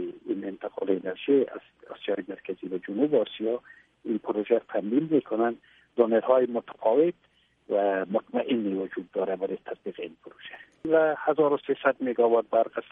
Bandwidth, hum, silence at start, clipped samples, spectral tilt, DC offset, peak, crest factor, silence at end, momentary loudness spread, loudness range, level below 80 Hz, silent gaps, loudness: 3.8 kHz; none; 0 s; under 0.1%; -9 dB/octave; under 0.1%; -8 dBFS; 20 dB; 0.1 s; 14 LU; 4 LU; -74 dBFS; none; -27 LUFS